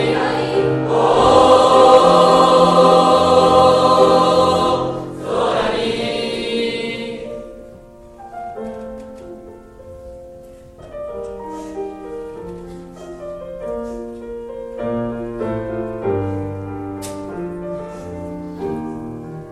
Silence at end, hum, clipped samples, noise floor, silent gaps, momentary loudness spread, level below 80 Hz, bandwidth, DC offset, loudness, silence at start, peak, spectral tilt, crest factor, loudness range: 0 s; none; under 0.1%; -40 dBFS; none; 22 LU; -44 dBFS; 12 kHz; under 0.1%; -15 LUFS; 0 s; 0 dBFS; -5.5 dB/octave; 16 dB; 21 LU